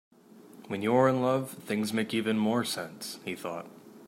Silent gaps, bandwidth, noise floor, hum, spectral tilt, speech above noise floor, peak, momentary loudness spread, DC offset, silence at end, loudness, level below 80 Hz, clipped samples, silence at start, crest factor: none; 16 kHz; -53 dBFS; none; -5 dB/octave; 24 dB; -12 dBFS; 14 LU; under 0.1%; 0 s; -30 LUFS; -76 dBFS; under 0.1%; 0.35 s; 20 dB